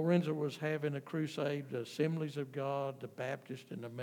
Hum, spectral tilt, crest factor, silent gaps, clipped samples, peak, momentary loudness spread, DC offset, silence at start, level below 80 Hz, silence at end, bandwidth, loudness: none; -7 dB/octave; 18 dB; none; under 0.1%; -20 dBFS; 8 LU; under 0.1%; 0 s; under -90 dBFS; 0 s; 18 kHz; -38 LUFS